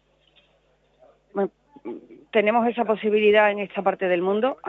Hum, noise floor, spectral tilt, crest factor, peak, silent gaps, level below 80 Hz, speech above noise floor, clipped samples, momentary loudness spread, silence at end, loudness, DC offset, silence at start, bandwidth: none; -63 dBFS; -8 dB/octave; 18 dB; -6 dBFS; none; -70 dBFS; 42 dB; under 0.1%; 20 LU; 0 s; -22 LUFS; under 0.1%; 1.35 s; 4 kHz